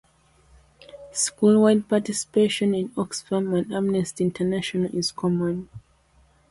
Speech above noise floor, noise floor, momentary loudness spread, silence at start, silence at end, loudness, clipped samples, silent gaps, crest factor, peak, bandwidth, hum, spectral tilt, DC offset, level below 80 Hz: 37 dB; -59 dBFS; 10 LU; 0.95 s; 0.7 s; -23 LUFS; under 0.1%; none; 16 dB; -6 dBFS; 11.5 kHz; none; -5 dB/octave; under 0.1%; -58 dBFS